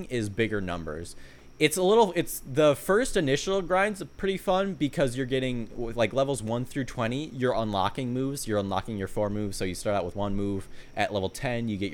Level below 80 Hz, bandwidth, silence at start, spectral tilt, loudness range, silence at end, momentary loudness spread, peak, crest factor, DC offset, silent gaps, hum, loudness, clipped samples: -44 dBFS; 19.5 kHz; 0 s; -5 dB/octave; 5 LU; 0 s; 9 LU; -6 dBFS; 22 dB; under 0.1%; none; none; -28 LUFS; under 0.1%